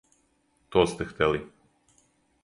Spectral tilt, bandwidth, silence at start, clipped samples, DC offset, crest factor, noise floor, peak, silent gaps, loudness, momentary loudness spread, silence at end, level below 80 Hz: -5.5 dB/octave; 11.5 kHz; 0.7 s; under 0.1%; under 0.1%; 24 dB; -69 dBFS; -6 dBFS; none; -27 LUFS; 8 LU; 1 s; -52 dBFS